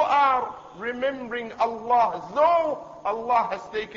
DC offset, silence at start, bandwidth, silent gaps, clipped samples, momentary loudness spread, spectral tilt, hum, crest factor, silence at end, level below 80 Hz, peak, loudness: under 0.1%; 0 s; 7.6 kHz; none; under 0.1%; 12 LU; -4.5 dB/octave; none; 16 dB; 0 s; -62 dBFS; -8 dBFS; -24 LUFS